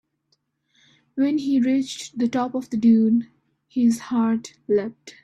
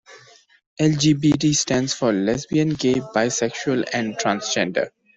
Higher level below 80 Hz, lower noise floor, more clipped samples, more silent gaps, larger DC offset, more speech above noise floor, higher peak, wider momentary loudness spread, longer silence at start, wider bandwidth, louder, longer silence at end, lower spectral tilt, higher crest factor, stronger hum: second, -66 dBFS vs -54 dBFS; first, -70 dBFS vs -51 dBFS; neither; second, none vs 0.66-0.77 s; neither; first, 49 dB vs 31 dB; about the same, -8 dBFS vs -6 dBFS; first, 12 LU vs 5 LU; first, 1.15 s vs 0.1 s; first, 12 kHz vs 8.2 kHz; about the same, -22 LUFS vs -21 LUFS; second, 0.15 s vs 0.3 s; first, -6 dB/octave vs -4.5 dB/octave; about the same, 14 dB vs 16 dB; neither